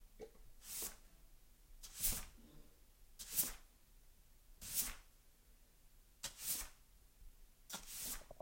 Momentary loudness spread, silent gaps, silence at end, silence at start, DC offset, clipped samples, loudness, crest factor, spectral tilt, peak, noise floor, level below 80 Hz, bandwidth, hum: 20 LU; none; 0 s; 0 s; under 0.1%; under 0.1%; -43 LUFS; 28 dB; -0.5 dB/octave; -22 dBFS; -67 dBFS; -60 dBFS; 16.5 kHz; none